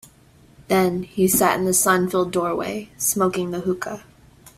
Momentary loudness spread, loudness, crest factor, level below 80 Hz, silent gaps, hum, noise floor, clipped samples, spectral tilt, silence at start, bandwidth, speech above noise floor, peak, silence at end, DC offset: 10 LU; -20 LUFS; 18 dB; -54 dBFS; none; none; -52 dBFS; under 0.1%; -4 dB/octave; 0.7 s; 16 kHz; 31 dB; -2 dBFS; 0.1 s; under 0.1%